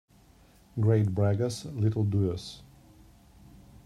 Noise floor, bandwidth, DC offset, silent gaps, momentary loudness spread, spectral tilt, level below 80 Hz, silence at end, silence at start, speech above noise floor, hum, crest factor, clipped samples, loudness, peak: -58 dBFS; 12 kHz; under 0.1%; none; 15 LU; -7.5 dB/octave; -58 dBFS; 1.25 s; 0.75 s; 32 dB; none; 18 dB; under 0.1%; -28 LUFS; -12 dBFS